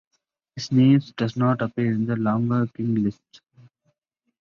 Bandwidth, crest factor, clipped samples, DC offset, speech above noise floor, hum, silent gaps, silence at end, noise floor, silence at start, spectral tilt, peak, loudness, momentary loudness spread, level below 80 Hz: 7 kHz; 16 dB; under 0.1%; under 0.1%; 55 dB; none; none; 1.3 s; -77 dBFS; 0.55 s; -8 dB/octave; -6 dBFS; -22 LUFS; 10 LU; -60 dBFS